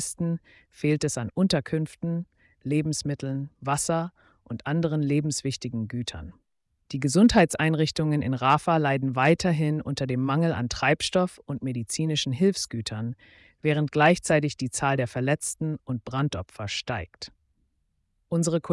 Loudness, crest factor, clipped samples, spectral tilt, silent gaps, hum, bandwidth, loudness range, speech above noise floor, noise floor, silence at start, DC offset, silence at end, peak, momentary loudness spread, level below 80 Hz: -26 LUFS; 16 dB; under 0.1%; -5 dB/octave; none; none; 12 kHz; 6 LU; 47 dB; -73 dBFS; 0 s; under 0.1%; 0 s; -8 dBFS; 12 LU; -52 dBFS